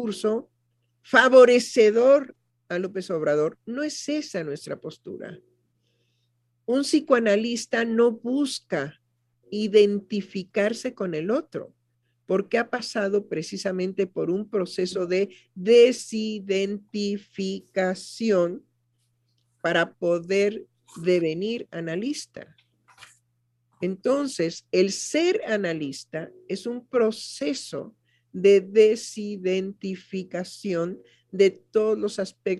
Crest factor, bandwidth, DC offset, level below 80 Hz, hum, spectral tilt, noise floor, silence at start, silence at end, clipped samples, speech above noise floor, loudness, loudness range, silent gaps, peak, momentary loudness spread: 22 dB; 12 kHz; under 0.1%; -74 dBFS; none; -4.5 dB/octave; -72 dBFS; 0 s; 0 s; under 0.1%; 48 dB; -24 LUFS; 7 LU; none; -2 dBFS; 15 LU